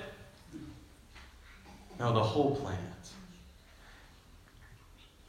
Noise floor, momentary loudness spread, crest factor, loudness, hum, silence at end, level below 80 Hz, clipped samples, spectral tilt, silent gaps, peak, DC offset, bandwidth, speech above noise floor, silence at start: -58 dBFS; 27 LU; 24 dB; -33 LUFS; none; 0.25 s; -58 dBFS; under 0.1%; -6.5 dB/octave; none; -14 dBFS; under 0.1%; 15 kHz; 26 dB; 0 s